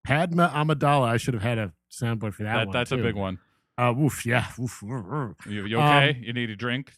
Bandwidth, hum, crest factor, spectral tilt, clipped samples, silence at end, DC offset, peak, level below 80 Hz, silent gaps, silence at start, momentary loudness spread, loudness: 15 kHz; none; 22 dB; -6 dB/octave; under 0.1%; 0.15 s; under 0.1%; -4 dBFS; -54 dBFS; none; 0.05 s; 13 LU; -25 LUFS